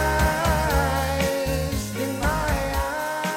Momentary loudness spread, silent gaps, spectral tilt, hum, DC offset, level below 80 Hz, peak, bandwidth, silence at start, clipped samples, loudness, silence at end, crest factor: 5 LU; none; -4.5 dB/octave; none; under 0.1%; -30 dBFS; -8 dBFS; 17 kHz; 0 s; under 0.1%; -24 LUFS; 0 s; 14 dB